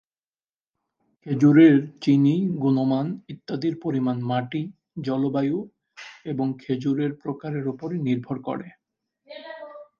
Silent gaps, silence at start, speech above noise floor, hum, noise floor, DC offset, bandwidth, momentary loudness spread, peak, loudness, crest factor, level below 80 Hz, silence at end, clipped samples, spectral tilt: none; 1.25 s; over 68 dB; none; under -90 dBFS; under 0.1%; 7 kHz; 21 LU; -4 dBFS; -23 LUFS; 18 dB; -68 dBFS; 0.15 s; under 0.1%; -8.5 dB/octave